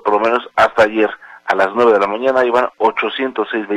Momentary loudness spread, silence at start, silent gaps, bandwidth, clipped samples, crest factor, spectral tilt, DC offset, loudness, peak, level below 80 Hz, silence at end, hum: 7 LU; 0.05 s; none; 11.5 kHz; under 0.1%; 14 dB; -5 dB/octave; under 0.1%; -15 LUFS; 0 dBFS; -54 dBFS; 0 s; none